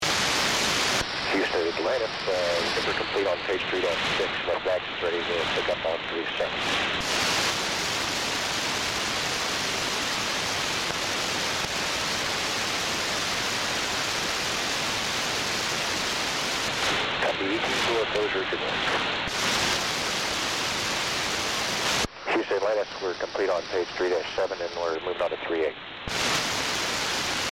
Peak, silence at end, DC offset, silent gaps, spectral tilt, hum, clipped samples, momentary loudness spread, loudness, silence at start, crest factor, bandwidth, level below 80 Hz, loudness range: -10 dBFS; 0 s; under 0.1%; none; -2 dB/octave; none; under 0.1%; 4 LU; -26 LUFS; 0 s; 18 dB; 16.5 kHz; -52 dBFS; 2 LU